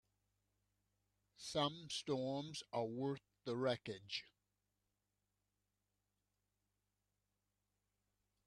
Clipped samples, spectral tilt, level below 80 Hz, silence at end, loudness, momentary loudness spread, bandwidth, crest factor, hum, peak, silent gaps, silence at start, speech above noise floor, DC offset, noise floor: under 0.1%; -4.5 dB/octave; -82 dBFS; 4.2 s; -44 LUFS; 7 LU; 12 kHz; 24 dB; 50 Hz at -80 dBFS; -24 dBFS; none; 1.4 s; 46 dB; under 0.1%; -89 dBFS